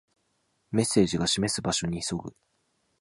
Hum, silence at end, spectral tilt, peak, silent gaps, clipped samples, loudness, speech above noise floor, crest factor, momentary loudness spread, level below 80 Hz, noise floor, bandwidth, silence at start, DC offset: none; 0.7 s; -4 dB/octave; -8 dBFS; none; under 0.1%; -27 LUFS; 46 dB; 20 dB; 10 LU; -54 dBFS; -73 dBFS; 11.5 kHz; 0.7 s; under 0.1%